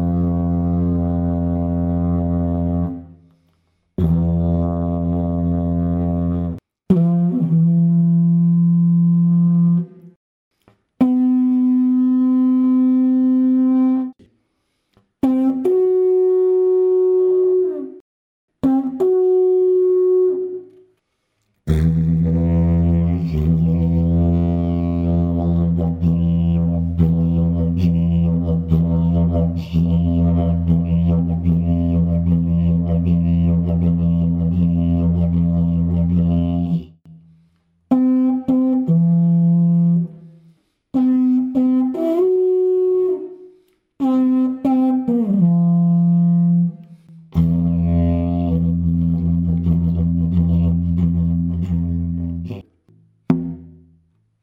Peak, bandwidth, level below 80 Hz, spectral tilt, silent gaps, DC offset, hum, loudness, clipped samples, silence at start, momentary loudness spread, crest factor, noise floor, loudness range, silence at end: -2 dBFS; 3.5 kHz; -32 dBFS; -12 dB/octave; 10.16-10.51 s, 18.01-18.48 s; under 0.1%; none; -17 LUFS; under 0.1%; 0 s; 6 LU; 14 dB; -70 dBFS; 4 LU; 0.75 s